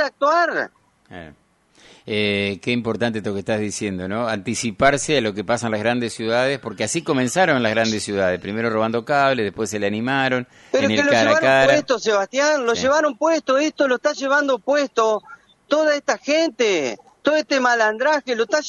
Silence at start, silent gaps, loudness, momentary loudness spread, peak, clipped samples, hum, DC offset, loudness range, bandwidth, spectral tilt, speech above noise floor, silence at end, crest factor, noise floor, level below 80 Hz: 0 s; none; -19 LUFS; 8 LU; -2 dBFS; under 0.1%; none; under 0.1%; 5 LU; 11.5 kHz; -4 dB/octave; 33 dB; 0 s; 16 dB; -53 dBFS; -56 dBFS